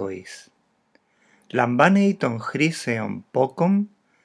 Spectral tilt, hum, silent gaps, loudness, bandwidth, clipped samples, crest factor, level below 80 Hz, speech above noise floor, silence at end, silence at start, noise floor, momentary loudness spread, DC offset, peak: -6.5 dB/octave; none; none; -22 LUFS; 11 kHz; under 0.1%; 22 dB; -80 dBFS; 43 dB; 0.4 s; 0 s; -64 dBFS; 16 LU; under 0.1%; 0 dBFS